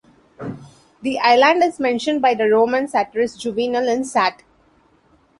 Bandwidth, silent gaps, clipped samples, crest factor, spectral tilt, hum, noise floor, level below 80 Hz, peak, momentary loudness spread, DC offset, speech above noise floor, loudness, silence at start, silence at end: 11.5 kHz; none; under 0.1%; 18 dB; -4 dB/octave; none; -57 dBFS; -60 dBFS; -2 dBFS; 19 LU; under 0.1%; 39 dB; -18 LUFS; 0.4 s; 1.05 s